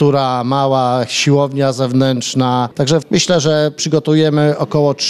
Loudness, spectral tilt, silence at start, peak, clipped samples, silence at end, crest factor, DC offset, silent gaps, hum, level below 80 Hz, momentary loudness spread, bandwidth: -14 LUFS; -5 dB/octave; 0 s; -2 dBFS; under 0.1%; 0 s; 12 dB; 0.2%; none; none; -54 dBFS; 3 LU; 12.5 kHz